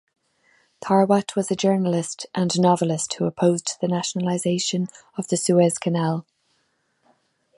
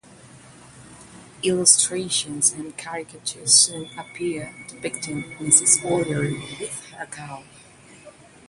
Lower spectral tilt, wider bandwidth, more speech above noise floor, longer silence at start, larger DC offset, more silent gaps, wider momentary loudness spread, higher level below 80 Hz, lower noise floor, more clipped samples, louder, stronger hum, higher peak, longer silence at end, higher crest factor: first, -5 dB/octave vs -2 dB/octave; about the same, 11.5 kHz vs 12 kHz; first, 47 dB vs 24 dB; first, 0.8 s vs 0.25 s; neither; neither; second, 8 LU vs 20 LU; second, -68 dBFS vs -60 dBFS; first, -69 dBFS vs -47 dBFS; neither; second, -22 LUFS vs -19 LUFS; neither; second, -4 dBFS vs 0 dBFS; first, 1.35 s vs 0.4 s; second, 18 dB vs 24 dB